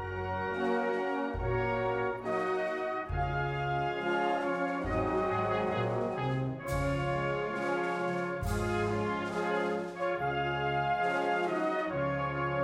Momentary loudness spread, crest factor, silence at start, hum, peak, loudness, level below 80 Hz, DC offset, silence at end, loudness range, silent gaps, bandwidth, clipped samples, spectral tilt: 3 LU; 14 dB; 0 s; none; -18 dBFS; -32 LUFS; -48 dBFS; under 0.1%; 0 s; 1 LU; none; 16 kHz; under 0.1%; -7 dB/octave